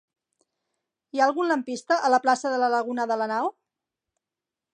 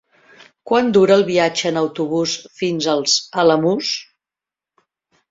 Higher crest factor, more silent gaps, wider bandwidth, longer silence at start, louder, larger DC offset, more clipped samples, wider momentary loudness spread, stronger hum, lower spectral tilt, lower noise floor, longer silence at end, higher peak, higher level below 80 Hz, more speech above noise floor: about the same, 20 dB vs 16 dB; neither; first, 10 kHz vs 7.8 kHz; first, 1.15 s vs 0.65 s; second, -24 LUFS vs -17 LUFS; neither; neither; about the same, 7 LU vs 9 LU; neither; about the same, -3 dB/octave vs -4 dB/octave; about the same, -89 dBFS vs -88 dBFS; about the same, 1.25 s vs 1.3 s; second, -8 dBFS vs -2 dBFS; second, -86 dBFS vs -60 dBFS; second, 65 dB vs 72 dB